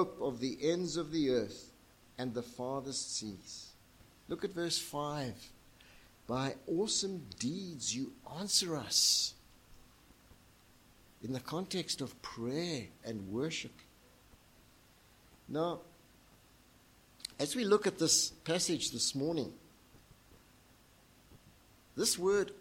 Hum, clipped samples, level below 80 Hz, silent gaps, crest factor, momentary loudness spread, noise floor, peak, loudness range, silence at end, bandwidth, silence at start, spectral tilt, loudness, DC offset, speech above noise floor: none; under 0.1%; -68 dBFS; none; 22 dB; 16 LU; -64 dBFS; -16 dBFS; 10 LU; 0 s; 16.5 kHz; 0 s; -3 dB/octave; -35 LUFS; under 0.1%; 28 dB